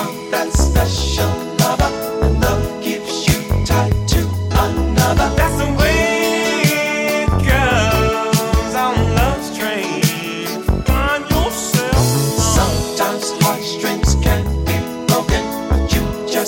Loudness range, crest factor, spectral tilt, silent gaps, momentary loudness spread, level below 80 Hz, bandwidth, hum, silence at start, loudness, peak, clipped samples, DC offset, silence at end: 2 LU; 12 dB; -4.5 dB/octave; none; 5 LU; -22 dBFS; 17 kHz; none; 0 s; -16 LUFS; -4 dBFS; under 0.1%; under 0.1%; 0 s